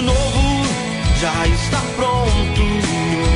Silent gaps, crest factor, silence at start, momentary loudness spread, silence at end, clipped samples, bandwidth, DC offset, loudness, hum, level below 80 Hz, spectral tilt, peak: none; 12 dB; 0 s; 2 LU; 0 s; under 0.1%; 11 kHz; under 0.1%; -18 LUFS; none; -20 dBFS; -5 dB/octave; -4 dBFS